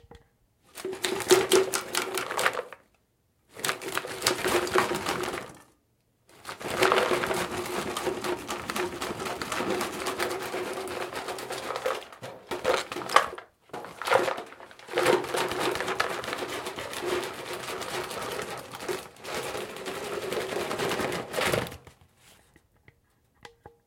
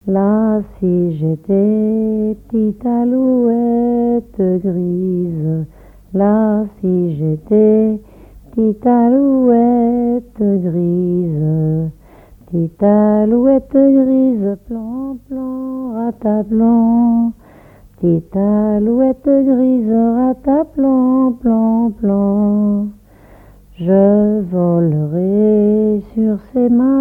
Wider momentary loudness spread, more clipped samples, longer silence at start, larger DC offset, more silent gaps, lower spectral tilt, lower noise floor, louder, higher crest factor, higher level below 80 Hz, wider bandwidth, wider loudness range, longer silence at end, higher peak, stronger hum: first, 13 LU vs 9 LU; neither; about the same, 0.1 s vs 0.05 s; neither; neither; second, -2.5 dB/octave vs -12 dB/octave; first, -70 dBFS vs -42 dBFS; second, -29 LUFS vs -14 LUFS; first, 30 dB vs 12 dB; second, -62 dBFS vs -44 dBFS; first, 17 kHz vs 3 kHz; about the same, 5 LU vs 3 LU; first, 0.15 s vs 0 s; about the same, 0 dBFS vs 0 dBFS; neither